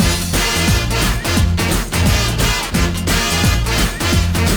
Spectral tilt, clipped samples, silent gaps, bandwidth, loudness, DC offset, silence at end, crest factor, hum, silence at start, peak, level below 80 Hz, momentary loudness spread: -4 dB/octave; under 0.1%; none; over 20 kHz; -16 LUFS; under 0.1%; 0 s; 12 dB; none; 0 s; -4 dBFS; -22 dBFS; 2 LU